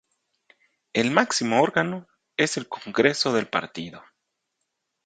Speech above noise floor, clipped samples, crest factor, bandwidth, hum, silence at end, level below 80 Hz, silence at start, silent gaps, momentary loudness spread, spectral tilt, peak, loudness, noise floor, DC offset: 56 dB; under 0.1%; 24 dB; 9.4 kHz; none; 1.05 s; -68 dBFS; 0.95 s; none; 14 LU; -3.5 dB/octave; -2 dBFS; -23 LUFS; -79 dBFS; under 0.1%